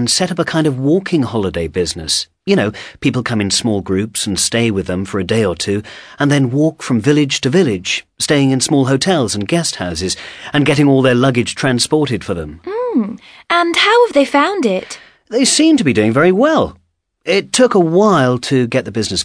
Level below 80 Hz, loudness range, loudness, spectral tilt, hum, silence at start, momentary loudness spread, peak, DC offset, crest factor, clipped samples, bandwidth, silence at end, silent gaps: -44 dBFS; 4 LU; -14 LUFS; -4.5 dB/octave; none; 0 s; 9 LU; 0 dBFS; under 0.1%; 14 dB; under 0.1%; 11 kHz; 0 s; none